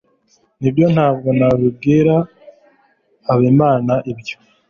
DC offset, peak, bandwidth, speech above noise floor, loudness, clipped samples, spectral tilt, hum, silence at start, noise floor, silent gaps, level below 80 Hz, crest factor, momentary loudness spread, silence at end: under 0.1%; -2 dBFS; 7 kHz; 45 dB; -15 LUFS; under 0.1%; -9 dB/octave; none; 0.6 s; -58 dBFS; none; -48 dBFS; 14 dB; 15 LU; 0.35 s